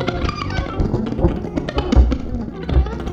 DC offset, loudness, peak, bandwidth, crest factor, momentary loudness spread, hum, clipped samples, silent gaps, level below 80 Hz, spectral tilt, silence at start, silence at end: under 0.1%; -21 LUFS; 0 dBFS; 7.2 kHz; 18 dB; 8 LU; none; under 0.1%; none; -22 dBFS; -7.5 dB/octave; 0 s; 0 s